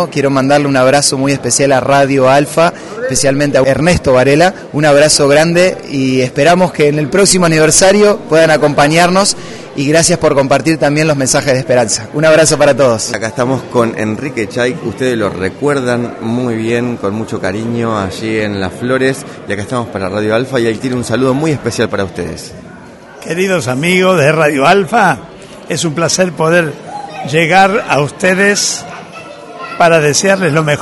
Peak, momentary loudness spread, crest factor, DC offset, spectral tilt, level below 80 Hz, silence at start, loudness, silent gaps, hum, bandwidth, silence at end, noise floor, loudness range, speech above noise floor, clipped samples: 0 dBFS; 10 LU; 12 dB; under 0.1%; -4 dB/octave; -42 dBFS; 0 s; -11 LUFS; none; none; 12 kHz; 0 s; -33 dBFS; 7 LU; 22 dB; 0.1%